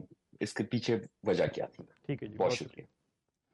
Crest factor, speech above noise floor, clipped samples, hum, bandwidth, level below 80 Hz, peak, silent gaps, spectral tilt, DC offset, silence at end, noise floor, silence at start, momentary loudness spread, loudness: 16 dB; 49 dB; under 0.1%; none; 11.5 kHz; -70 dBFS; -18 dBFS; none; -5.5 dB/octave; under 0.1%; 0.7 s; -83 dBFS; 0 s; 16 LU; -34 LUFS